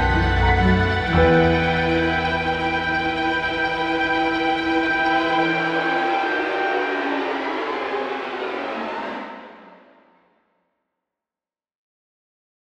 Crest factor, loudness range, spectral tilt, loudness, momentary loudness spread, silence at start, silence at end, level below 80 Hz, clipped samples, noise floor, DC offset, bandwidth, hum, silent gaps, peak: 18 dB; 13 LU; -6.5 dB/octave; -20 LUFS; 9 LU; 0 s; 3.05 s; -34 dBFS; under 0.1%; under -90 dBFS; under 0.1%; 9.2 kHz; none; none; -4 dBFS